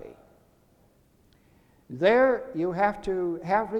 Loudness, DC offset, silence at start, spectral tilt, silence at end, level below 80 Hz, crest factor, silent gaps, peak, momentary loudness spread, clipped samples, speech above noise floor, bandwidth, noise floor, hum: -25 LUFS; under 0.1%; 0 s; -7 dB/octave; 0 s; -56 dBFS; 20 dB; none; -8 dBFS; 9 LU; under 0.1%; 37 dB; 9.4 kHz; -62 dBFS; none